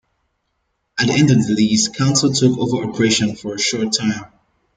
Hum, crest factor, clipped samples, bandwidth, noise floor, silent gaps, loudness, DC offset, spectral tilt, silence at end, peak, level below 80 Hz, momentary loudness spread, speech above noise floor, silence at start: none; 16 dB; under 0.1%; 9.6 kHz; -70 dBFS; none; -16 LUFS; under 0.1%; -4.5 dB/octave; 0.5 s; -2 dBFS; -52 dBFS; 7 LU; 54 dB; 0.95 s